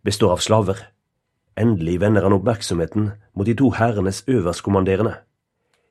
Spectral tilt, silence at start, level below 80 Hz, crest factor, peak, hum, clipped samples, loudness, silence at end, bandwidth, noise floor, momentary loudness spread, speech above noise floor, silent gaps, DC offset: -6 dB/octave; 0.05 s; -46 dBFS; 18 dB; 0 dBFS; none; under 0.1%; -19 LUFS; 0.7 s; 13 kHz; -74 dBFS; 8 LU; 55 dB; none; under 0.1%